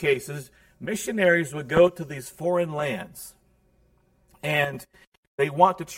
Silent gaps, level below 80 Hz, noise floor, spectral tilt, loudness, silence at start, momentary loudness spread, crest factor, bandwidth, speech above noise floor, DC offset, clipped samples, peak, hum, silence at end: 5.07-5.12 s, 5.18-5.38 s; -58 dBFS; -63 dBFS; -5 dB/octave; -24 LUFS; 0 s; 19 LU; 22 dB; 16.5 kHz; 39 dB; under 0.1%; under 0.1%; -4 dBFS; none; 0 s